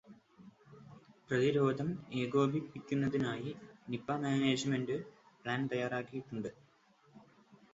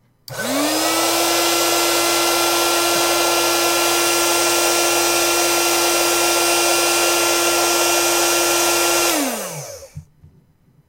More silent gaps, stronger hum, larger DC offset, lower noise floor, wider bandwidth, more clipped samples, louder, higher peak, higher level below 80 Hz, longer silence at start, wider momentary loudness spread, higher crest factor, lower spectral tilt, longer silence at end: neither; neither; neither; first, -68 dBFS vs -54 dBFS; second, 7.6 kHz vs 16 kHz; neither; second, -36 LUFS vs -15 LUFS; second, -18 dBFS vs -4 dBFS; second, -72 dBFS vs -52 dBFS; second, 0.1 s vs 0.3 s; first, 14 LU vs 4 LU; about the same, 18 dB vs 14 dB; first, -5.5 dB/octave vs -0.5 dB/octave; second, 0.55 s vs 0.85 s